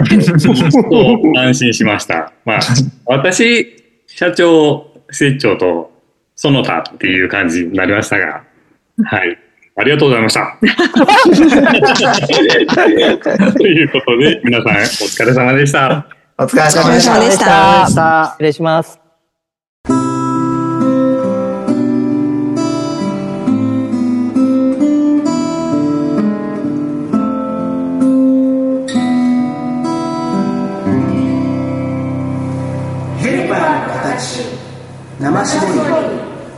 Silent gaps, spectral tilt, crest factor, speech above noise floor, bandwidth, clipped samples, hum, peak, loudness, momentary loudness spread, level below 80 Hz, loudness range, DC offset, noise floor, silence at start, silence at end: 19.69-19.84 s; -5 dB/octave; 12 dB; 61 dB; 12.5 kHz; under 0.1%; none; 0 dBFS; -12 LUFS; 10 LU; -48 dBFS; 7 LU; under 0.1%; -71 dBFS; 0 s; 0 s